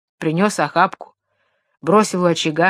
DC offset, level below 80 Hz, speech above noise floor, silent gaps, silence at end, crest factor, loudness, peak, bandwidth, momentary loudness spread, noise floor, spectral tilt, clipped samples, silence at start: under 0.1%; -66 dBFS; 51 dB; none; 0 s; 18 dB; -18 LUFS; 0 dBFS; 14.5 kHz; 9 LU; -68 dBFS; -5 dB/octave; under 0.1%; 0.2 s